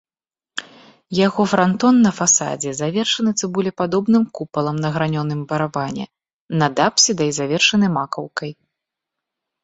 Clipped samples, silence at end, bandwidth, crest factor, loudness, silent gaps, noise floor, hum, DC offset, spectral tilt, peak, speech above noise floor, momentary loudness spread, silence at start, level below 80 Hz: under 0.1%; 1.1 s; 8.2 kHz; 20 dB; -18 LUFS; 6.33-6.49 s; under -90 dBFS; none; under 0.1%; -4 dB/octave; 0 dBFS; over 72 dB; 14 LU; 0.55 s; -58 dBFS